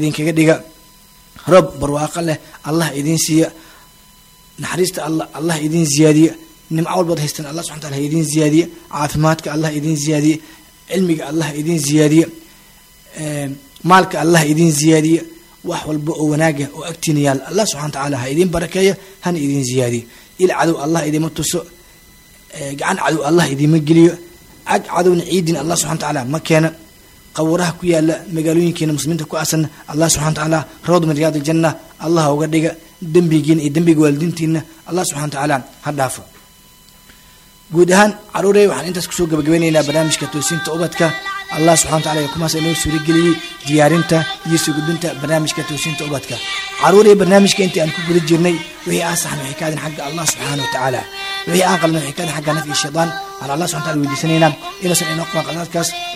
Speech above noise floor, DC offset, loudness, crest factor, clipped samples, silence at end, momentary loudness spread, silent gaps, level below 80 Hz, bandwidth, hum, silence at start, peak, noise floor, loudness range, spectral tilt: 30 dB; under 0.1%; -16 LUFS; 16 dB; under 0.1%; 0 s; 10 LU; none; -46 dBFS; 16 kHz; none; 0 s; 0 dBFS; -45 dBFS; 4 LU; -5 dB/octave